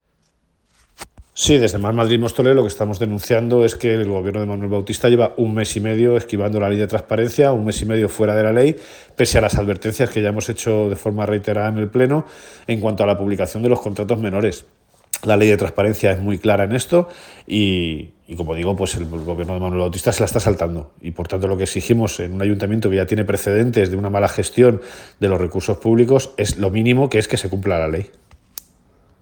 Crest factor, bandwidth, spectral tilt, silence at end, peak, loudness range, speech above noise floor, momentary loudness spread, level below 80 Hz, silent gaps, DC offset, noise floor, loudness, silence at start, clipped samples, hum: 18 dB; over 20 kHz; -5.5 dB/octave; 1.15 s; 0 dBFS; 3 LU; 47 dB; 10 LU; -42 dBFS; none; under 0.1%; -65 dBFS; -18 LUFS; 1 s; under 0.1%; none